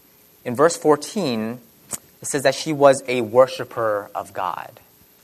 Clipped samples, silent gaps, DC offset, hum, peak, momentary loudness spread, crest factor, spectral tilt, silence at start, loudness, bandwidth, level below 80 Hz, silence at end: under 0.1%; none; under 0.1%; none; 0 dBFS; 16 LU; 20 dB; -4 dB/octave; 0.45 s; -20 LUFS; 13.5 kHz; -66 dBFS; 0.55 s